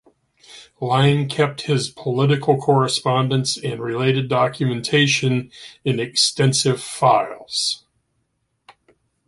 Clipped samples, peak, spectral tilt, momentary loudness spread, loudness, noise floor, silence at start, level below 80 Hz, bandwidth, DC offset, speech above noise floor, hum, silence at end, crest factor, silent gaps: under 0.1%; -2 dBFS; -4.5 dB/octave; 8 LU; -19 LUFS; -71 dBFS; 0.5 s; -58 dBFS; 11.5 kHz; under 0.1%; 52 dB; none; 1.5 s; 18 dB; none